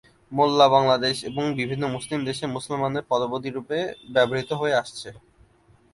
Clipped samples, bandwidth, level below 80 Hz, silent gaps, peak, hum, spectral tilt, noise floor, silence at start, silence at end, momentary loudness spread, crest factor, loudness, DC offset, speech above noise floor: under 0.1%; 11.5 kHz; -60 dBFS; none; -4 dBFS; none; -5 dB/octave; -58 dBFS; 0.3 s; 0.75 s; 12 LU; 20 dB; -23 LUFS; under 0.1%; 34 dB